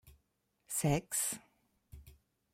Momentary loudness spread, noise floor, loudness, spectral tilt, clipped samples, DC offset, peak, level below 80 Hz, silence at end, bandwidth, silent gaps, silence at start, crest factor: 7 LU; -80 dBFS; -35 LUFS; -4 dB/octave; under 0.1%; under 0.1%; -20 dBFS; -60 dBFS; 0.4 s; 16.5 kHz; none; 0.05 s; 20 dB